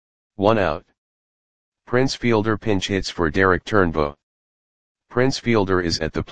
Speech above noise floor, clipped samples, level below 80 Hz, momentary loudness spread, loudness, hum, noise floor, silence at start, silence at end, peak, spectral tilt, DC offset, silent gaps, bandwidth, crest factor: over 70 dB; under 0.1%; -42 dBFS; 6 LU; -21 LUFS; none; under -90 dBFS; 0.3 s; 0 s; 0 dBFS; -5.5 dB/octave; 2%; 0.98-1.72 s, 4.23-4.95 s; 9.8 kHz; 20 dB